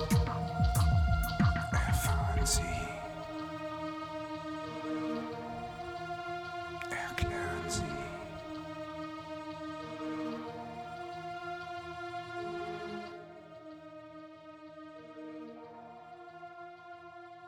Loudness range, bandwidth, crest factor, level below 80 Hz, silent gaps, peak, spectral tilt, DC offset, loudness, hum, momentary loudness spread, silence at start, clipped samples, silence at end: 17 LU; 19.5 kHz; 20 dB; -42 dBFS; none; -16 dBFS; -5 dB/octave; under 0.1%; -36 LUFS; none; 19 LU; 0 s; under 0.1%; 0 s